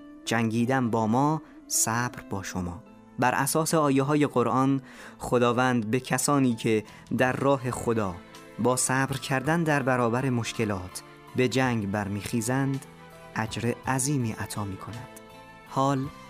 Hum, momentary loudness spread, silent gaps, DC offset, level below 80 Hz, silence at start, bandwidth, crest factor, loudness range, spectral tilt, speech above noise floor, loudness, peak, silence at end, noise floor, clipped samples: none; 12 LU; none; under 0.1%; -58 dBFS; 0 s; 15.5 kHz; 18 dB; 5 LU; -5 dB/octave; 22 dB; -26 LUFS; -8 dBFS; 0 s; -48 dBFS; under 0.1%